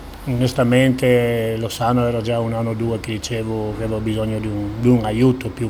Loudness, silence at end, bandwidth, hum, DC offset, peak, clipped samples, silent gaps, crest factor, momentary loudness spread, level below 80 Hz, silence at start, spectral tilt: -19 LUFS; 0 s; 17 kHz; none; under 0.1%; -2 dBFS; under 0.1%; none; 18 dB; 9 LU; -38 dBFS; 0 s; -6.5 dB/octave